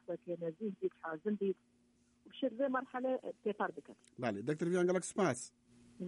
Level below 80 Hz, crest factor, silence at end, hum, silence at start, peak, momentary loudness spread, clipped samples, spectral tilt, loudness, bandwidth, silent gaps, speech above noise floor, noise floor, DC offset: -82 dBFS; 18 dB; 0 s; none; 0.1 s; -22 dBFS; 10 LU; under 0.1%; -5.5 dB/octave; -38 LUFS; 11.5 kHz; none; 28 dB; -66 dBFS; under 0.1%